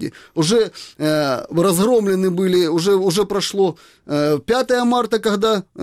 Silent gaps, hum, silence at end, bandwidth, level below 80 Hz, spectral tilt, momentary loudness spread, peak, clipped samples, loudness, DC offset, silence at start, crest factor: none; none; 0 s; 16 kHz; -54 dBFS; -5 dB/octave; 5 LU; -6 dBFS; under 0.1%; -18 LUFS; under 0.1%; 0 s; 12 dB